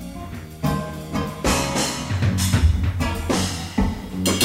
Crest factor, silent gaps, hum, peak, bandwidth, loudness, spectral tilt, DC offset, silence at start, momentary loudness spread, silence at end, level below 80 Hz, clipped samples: 18 dB; none; none; -4 dBFS; 16 kHz; -23 LUFS; -4.5 dB/octave; under 0.1%; 0 s; 8 LU; 0 s; -30 dBFS; under 0.1%